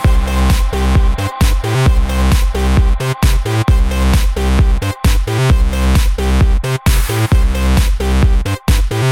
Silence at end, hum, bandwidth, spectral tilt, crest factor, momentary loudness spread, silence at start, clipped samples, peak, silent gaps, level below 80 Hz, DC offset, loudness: 0 s; none; 16.5 kHz; -5.5 dB/octave; 10 dB; 2 LU; 0 s; under 0.1%; -2 dBFS; none; -12 dBFS; 0.2%; -14 LUFS